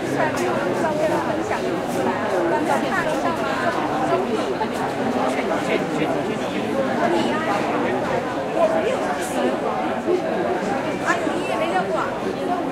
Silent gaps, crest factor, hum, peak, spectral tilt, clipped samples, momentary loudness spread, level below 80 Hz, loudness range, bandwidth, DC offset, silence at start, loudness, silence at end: none; 18 dB; none; -4 dBFS; -5 dB/octave; under 0.1%; 3 LU; -52 dBFS; 1 LU; 16 kHz; under 0.1%; 0 s; -22 LUFS; 0 s